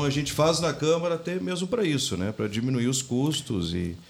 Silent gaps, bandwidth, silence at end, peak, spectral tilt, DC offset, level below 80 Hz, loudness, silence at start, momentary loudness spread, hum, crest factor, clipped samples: none; 19 kHz; 0.05 s; -10 dBFS; -5 dB/octave; under 0.1%; -52 dBFS; -26 LUFS; 0 s; 6 LU; none; 16 dB; under 0.1%